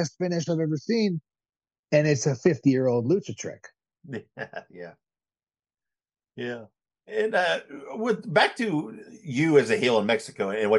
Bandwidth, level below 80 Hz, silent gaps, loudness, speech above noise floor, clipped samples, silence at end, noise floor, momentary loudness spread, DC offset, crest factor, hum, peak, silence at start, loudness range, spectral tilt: 11.5 kHz; -72 dBFS; 1.79-1.83 s; -25 LUFS; over 65 dB; under 0.1%; 0 s; under -90 dBFS; 17 LU; under 0.1%; 20 dB; none; -6 dBFS; 0 s; 16 LU; -5.5 dB/octave